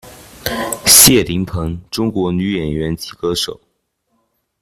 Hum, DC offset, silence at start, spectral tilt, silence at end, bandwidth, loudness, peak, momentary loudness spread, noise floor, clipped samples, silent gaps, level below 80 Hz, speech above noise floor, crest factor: none; under 0.1%; 0.05 s; -2.5 dB/octave; 1.05 s; 16 kHz; -13 LUFS; 0 dBFS; 18 LU; -67 dBFS; 0.3%; none; -38 dBFS; 52 dB; 16 dB